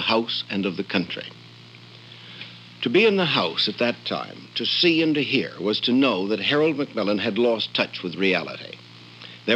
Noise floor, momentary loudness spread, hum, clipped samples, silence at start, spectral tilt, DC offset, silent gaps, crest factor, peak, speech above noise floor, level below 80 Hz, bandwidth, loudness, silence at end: -45 dBFS; 20 LU; none; under 0.1%; 0 s; -6 dB/octave; under 0.1%; none; 18 dB; -4 dBFS; 23 dB; -74 dBFS; 9 kHz; -22 LUFS; 0 s